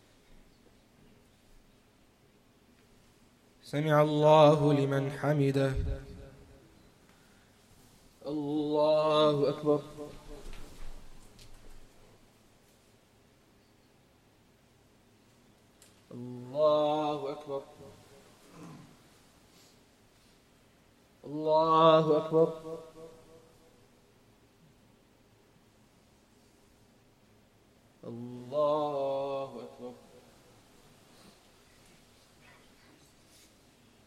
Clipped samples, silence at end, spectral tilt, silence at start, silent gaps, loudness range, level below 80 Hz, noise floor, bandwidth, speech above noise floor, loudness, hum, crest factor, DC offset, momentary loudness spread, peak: under 0.1%; 4.15 s; -7 dB/octave; 3.65 s; none; 18 LU; -54 dBFS; -64 dBFS; 13.5 kHz; 37 dB; -28 LUFS; none; 24 dB; under 0.1%; 28 LU; -10 dBFS